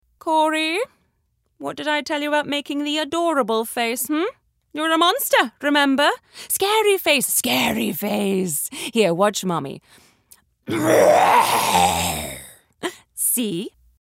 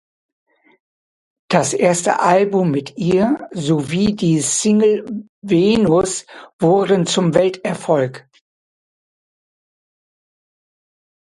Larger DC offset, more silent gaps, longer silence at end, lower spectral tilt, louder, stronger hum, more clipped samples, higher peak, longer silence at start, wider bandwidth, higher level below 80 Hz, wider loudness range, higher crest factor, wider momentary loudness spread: neither; second, none vs 5.29-5.42 s, 6.53-6.59 s; second, 0.3 s vs 3.15 s; second, -3 dB/octave vs -5 dB/octave; second, -19 LUFS vs -16 LUFS; neither; neither; second, -4 dBFS vs 0 dBFS; second, 0.25 s vs 1.5 s; first, 16 kHz vs 11.5 kHz; second, -58 dBFS vs -52 dBFS; about the same, 4 LU vs 6 LU; about the same, 18 dB vs 18 dB; first, 15 LU vs 8 LU